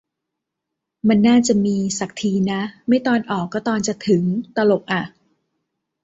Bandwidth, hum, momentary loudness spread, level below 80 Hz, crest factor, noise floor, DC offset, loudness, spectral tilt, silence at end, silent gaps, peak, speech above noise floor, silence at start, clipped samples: 8 kHz; none; 9 LU; -58 dBFS; 16 dB; -81 dBFS; under 0.1%; -19 LUFS; -5.5 dB/octave; 0.95 s; none; -4 dBFS; 63 dB; 1.05 s; under 0.1%